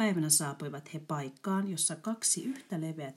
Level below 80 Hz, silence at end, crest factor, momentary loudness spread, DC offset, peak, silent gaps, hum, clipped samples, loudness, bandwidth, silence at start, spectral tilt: -88 dBFS; 0.05 s; 22 dB; 12 LU; under 0.1%; -12 dBFS; none; none; under 0.1%; -31 LUFS; 16 kHz; 0 s; -3.5 dB/octave